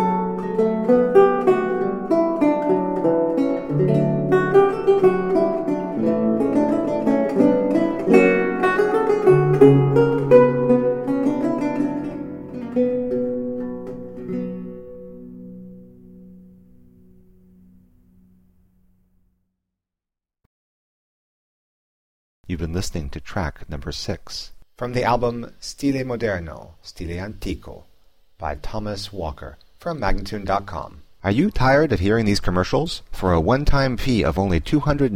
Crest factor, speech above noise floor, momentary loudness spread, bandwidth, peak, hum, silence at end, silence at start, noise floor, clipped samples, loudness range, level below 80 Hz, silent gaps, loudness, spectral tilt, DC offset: 20 dB; 66 dB; 17 LU; 15 kHz; 0 dBFS; none; 0 s; 0 s; -87 dBFS; under 0.1%; 15 LU; -36 dBFS; 20.46-22.44 s; -20 LUFS; -7 dB/octave; under 0.1%